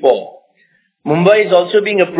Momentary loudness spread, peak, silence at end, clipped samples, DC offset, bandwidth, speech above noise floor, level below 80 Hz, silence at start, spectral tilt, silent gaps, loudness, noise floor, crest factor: 9 LU; 0 dBFS; 0 s; under 0.1%; under 0.1%; 4 kHz; 46 dB; -64 dBFS; 0 s; -10 dB/octave; none; -12 LUFS; -57 dBFS; 14 dB